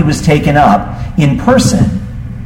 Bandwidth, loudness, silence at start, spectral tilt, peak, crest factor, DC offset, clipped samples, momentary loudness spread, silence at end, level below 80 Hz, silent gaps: 16 kHz; -10 LUFS; 0 s; -6 dB/octave; 0 dBFS; 10 dB; under 0.1%; under 0.1%; 10 LU; 0 s; -26 dBFS; none